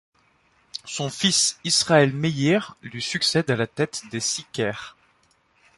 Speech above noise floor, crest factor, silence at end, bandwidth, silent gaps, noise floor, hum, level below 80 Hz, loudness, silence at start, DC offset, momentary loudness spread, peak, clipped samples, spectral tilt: 40 dB; 20 dB; 0.9 s; 11.5 kHz; none; -63 dBFS; none; -62 dBFS; -22 LUFS; 0.75 s; under 0.1%; 16 LU; -6 dBFS; under 0.1%; -3.5 dB/octave